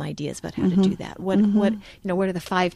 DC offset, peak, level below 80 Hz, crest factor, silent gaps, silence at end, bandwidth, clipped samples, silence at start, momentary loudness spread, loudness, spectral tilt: under 0.1%; -8 dBFS; -52 dBFS; 14 dB; none; 0 s; 12.5 kHz; under 0.1%; 0 s; 10 LU; -23 LUFS; -7 dB/octave